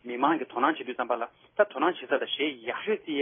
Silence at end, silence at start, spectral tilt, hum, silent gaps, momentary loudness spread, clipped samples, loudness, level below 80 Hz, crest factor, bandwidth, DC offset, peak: 0 s; 0.05 s; -8 dB/octave; none; none; 7 LU; under 0.1%; -29 LUFS; -80 dBFS; 20 dB; 3.7 kHz; under 0.1%; -8 dBFS